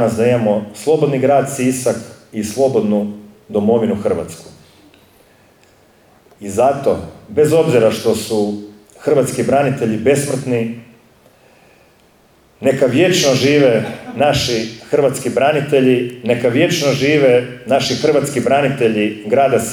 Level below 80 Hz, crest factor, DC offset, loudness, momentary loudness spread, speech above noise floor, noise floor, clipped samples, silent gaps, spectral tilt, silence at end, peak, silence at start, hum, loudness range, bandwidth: -52 dBFS; 14 dB; under 0.1%; -15 LUFS; 10 LU; 36 dB; -51 dBFS; under 0.1%; none; -5 dB/octave; 0 s; -2 dBFS; 0 s; none; 6 LU; 18.5 kHz